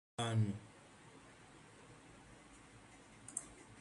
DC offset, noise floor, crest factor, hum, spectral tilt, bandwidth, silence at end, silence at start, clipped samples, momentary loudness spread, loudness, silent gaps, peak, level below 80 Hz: under 0.1%; -61 dBFS; 24 dB; none; -5 dB/octave; 11.5 kHz; 0 s; 0.2 s; under 0.1%; 22 LU; -41 LUFS; none; -22 dBFS; -70 dBFS